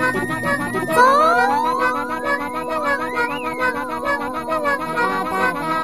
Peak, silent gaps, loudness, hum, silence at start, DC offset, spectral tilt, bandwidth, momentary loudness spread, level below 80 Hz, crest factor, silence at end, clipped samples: -2 dBFS; none; -19 LUFS; none; 0 s; 0.6%; -4.5 dB/octave; 15.5 kHz; 8 LU; -50 dBFS; 18 dB; 0 s; under 0.1%